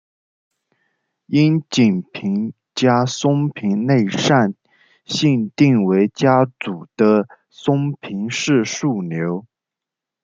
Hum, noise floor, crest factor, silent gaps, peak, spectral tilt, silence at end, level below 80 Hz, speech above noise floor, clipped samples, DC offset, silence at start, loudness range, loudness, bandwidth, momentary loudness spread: none; -85 dBFS; 16 dB; none; -2 dBFS; -6 dB/octave; 0.8 s; -62 dBFS; 69 dB; under 0.1%; under 0.1%; 1.3 s; 3 LU; -18 LUFS; 7.8 kHz; 10 LU